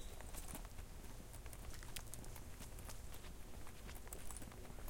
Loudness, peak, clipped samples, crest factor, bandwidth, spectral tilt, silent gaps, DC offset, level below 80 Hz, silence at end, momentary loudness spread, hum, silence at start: -54 LUFS; -24 dBFS; under 0.1%; 26 dB; 17 kHz; -3.5 dB/octave; none; under 0.1%; -54 dBFS; 0 s; 5 LU; none; 0 s